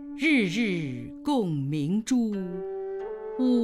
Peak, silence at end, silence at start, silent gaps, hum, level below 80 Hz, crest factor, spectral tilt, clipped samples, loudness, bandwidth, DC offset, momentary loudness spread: -12 dBFS; 0 s; 0 s; none; none; -60 dBFS; 14 dB; -6 dB/octave; under 0.1%; -28 LUFS; 12.5 kHz; under 0.1%; 11 LU